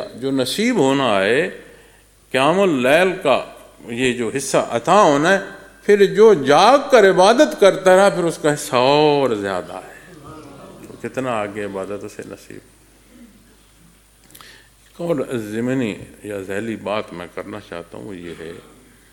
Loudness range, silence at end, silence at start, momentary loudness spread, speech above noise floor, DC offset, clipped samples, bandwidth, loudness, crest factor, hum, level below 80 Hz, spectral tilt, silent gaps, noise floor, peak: 16 LU; 0.55 s; 0 s; 21 LU; 34 dB; under 0.1%; under 0.1%; 17.5 kHz; -16 LUFS; 18 dB; none; -56 dBFS; -4.5 dB/octave; none; -51 dBFS; 0 dBFS